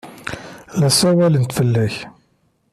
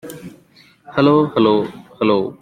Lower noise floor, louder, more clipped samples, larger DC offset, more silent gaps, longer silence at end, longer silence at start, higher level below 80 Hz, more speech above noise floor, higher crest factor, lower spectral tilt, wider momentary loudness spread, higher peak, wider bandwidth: first, -62 dBFS vs -50 dBFS; about the same, -16 LUFS vs -16 LUFS; neither; neither; neither; first, 0.65 s vs 0.1 s; about the same, 0.05 s vs 0.05 s; about the same, -52 dBFS vs -56 dBFS; first, 46 dB vs 35 dB; about the same, 16 dB vs 16 dB; second, -5 dB/octave vs -7.5 dB/octave; about the same, 17 LU vs 17 LU; about the same, -2 dBFS vs -2 dBFS; second, 14.5 kHz vs 16 kHz